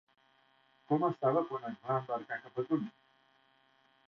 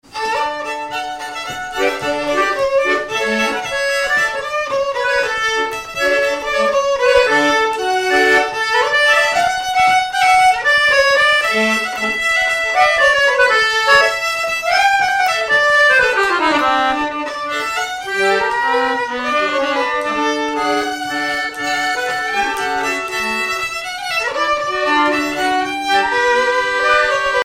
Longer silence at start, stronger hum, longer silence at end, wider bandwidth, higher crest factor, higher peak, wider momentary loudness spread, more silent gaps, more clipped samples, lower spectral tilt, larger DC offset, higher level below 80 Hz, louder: first, 0.9 s vs 0.1 s; neither; first, 1.2 s vs 0 s; second, 6.2 kHz vs 16.5 kHz; first, 20 dB vs 14 dB; second, -16 dBFS vs -2 dBFS; about the same, 10 LU vs 8 LU; neither; neither; first, -7 dB/octave vs -1.5 dB/octave; neither; second, -80 dBFS vs -48 dBFS; second, -35 LUFS vs -15 LUFS